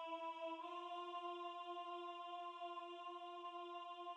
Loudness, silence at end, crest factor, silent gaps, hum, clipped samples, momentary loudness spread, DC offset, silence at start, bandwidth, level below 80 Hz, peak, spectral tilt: -50 LUFS; 0 s; 12 dB; none; none; under 0.1%; 3 LU; under 0.1%; 0 s; 10 kHz; under -90 dBFS; -38 dBFS; -1.5 dB/octave